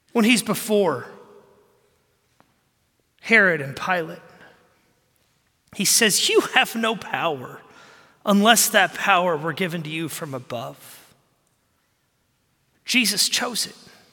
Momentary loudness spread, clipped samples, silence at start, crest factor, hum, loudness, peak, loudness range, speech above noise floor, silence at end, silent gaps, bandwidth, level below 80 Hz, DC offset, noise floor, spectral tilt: 17 LU; under 0.1%; 0.15 s; 22 dB; none; -20 LUFS; -2 dBFS; 7 LU; 47 dB; 0.4 s; none; 17.5 kHz; -70 dBFS; under 0.1%; -68 dBFS; -2.5 dB/octave